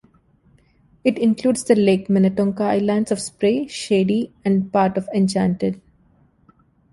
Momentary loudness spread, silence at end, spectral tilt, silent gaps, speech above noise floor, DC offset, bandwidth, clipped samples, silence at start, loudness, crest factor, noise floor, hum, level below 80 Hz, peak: 6 LU; 1.15 s; -6.5 dB/octave; none; 38 dB; under 0.1%; 11.5 kHz; under 0.1%; 1.05 s; -19 LUFS; 18 dB; -57 dBFS; none; -56 dBFS; -2 dBFS